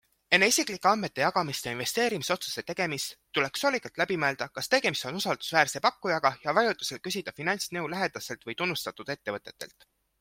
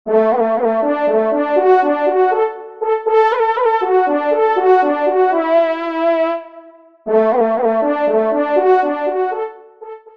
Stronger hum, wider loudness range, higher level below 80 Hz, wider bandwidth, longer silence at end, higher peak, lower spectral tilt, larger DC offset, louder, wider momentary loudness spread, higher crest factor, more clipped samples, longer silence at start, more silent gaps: neither; about the same, 4 LU vs 2 LU; about the same, -68 dBFS vs -66 dBFS; first, 16.5 kHz vs 6 kHz; first, 0.55 s vs 0.2 s; about the same, -4 dBFS vs -2 dBFS; second, -2.5 dB/octave vs -7 dB/octave; second, under 0.1% vs 0.3%; second, -28 LUFS vs -15 LUFS; first, 10 LU vs 7 LU; first, 24 dB vs 14 dB; neither; first, 0.3 s vs 0.05 s; neither